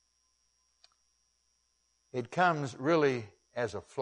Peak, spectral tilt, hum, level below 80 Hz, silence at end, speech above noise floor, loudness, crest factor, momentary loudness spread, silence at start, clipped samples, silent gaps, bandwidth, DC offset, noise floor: -14 dBFS; -6 dB/octave; 60 Hz at -60 dBFS; -74 dBFS; 0 s; 45 dB; -31 LUFS; 22 dB; 13 LU; 2.15 s; under 0.1%; none; 10.5 kHz; under 0.1%; -76 dBFS